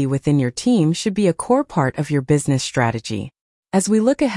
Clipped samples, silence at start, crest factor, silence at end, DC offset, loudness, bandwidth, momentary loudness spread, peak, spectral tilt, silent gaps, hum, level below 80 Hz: under 0.1%; 0 s; 14 dB; 0 s; under 0.1%; -19 LUFS; 12 kHz; 6 LU; -4 dBFS; -6 dB/octave; 3.41-3.63 s; none; -50 dBFS